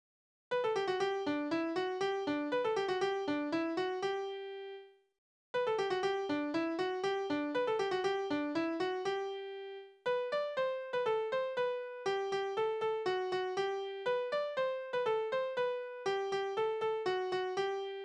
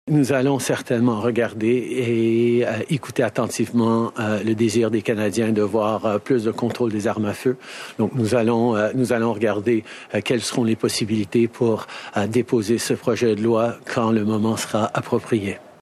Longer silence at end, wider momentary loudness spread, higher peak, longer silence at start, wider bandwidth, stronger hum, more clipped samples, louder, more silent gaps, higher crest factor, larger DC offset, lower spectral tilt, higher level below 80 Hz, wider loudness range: second, 0 s vs 0.2 s; about the same, 5 LU vs 5 LU; second, -22 dBFS vs -6 dBFS; first, 0.5 s vs 0.05 s; second, 9.8 kHz vs 14 kHz; neither; neither; second, -36 LUFS vs -21 LUFS; first, 5.18-5.54 s vs none; about the same, 14 dB vs 14 dB; neither; second, -4.5 dB/octave vs -6 dB/octave; second, -78 dBFS vs -66 dBFS; about the same, 2 LU vs 1 LU